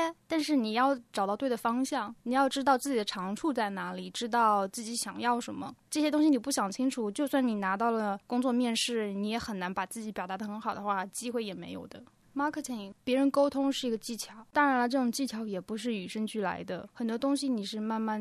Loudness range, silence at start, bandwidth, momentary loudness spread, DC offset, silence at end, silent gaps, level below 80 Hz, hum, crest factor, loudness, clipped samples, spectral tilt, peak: 4 LU; 0 s; 14 kHz; 10 LU; under 0.1%; 0 s; none; -70 dBFS; none; 18 dB; -31 LUFS; under 0.1%; -4 dB/octave; -14 dBFS